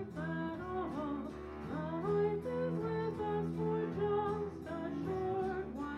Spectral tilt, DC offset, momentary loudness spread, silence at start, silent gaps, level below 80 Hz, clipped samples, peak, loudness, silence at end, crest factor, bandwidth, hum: -8.5 dB/octave; under 0.1%; 7 LU; 0 s; none; -58 dBFS; under 0.1%; -24 dBFS; -38 LUFS; 0 s; 14 dB; 11 kHz; none